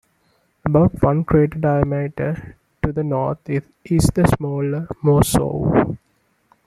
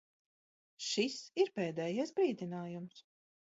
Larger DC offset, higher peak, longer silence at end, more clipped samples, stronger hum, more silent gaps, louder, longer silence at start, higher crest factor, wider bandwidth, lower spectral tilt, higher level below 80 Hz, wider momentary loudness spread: neither; first, -2 dBFS vs -18 dBFS; first, 0.7 s vs 0.5 s; neither; neither; neither; first, -19 LUFS vs -37 LUFS; second, 0.65 s vs 0.8 s; about the same, 18 dB vs 20 dB; first, 15 kHz vs 7.6 kHz; first, -7 dB/octave vs -4 dB/octave; first, -36 dBFS vs -86 dBFS; about the same, 10 LU vs 11 LU